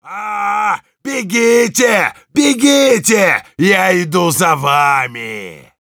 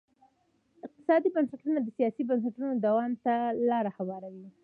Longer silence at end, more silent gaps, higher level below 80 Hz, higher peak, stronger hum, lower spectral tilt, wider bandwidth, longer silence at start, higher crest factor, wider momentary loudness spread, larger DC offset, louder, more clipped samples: first, 0.3 s vs 0.15 s; neither; first, -62 dBFS vs -82 dBFS; first, 0 dBFS vs -14 dBFS; neither; second, -3.5 dB/octave vs -9.5 dB/octave; first, over 20 kHz vs 4.7 kHz; second, 0.05 s vs 0.85 s; about the same, 14 dB vs 16 dB; about the same, 12 LU vs 13 LU; neither; first, -12 LUFS vs -29 LUFS; neither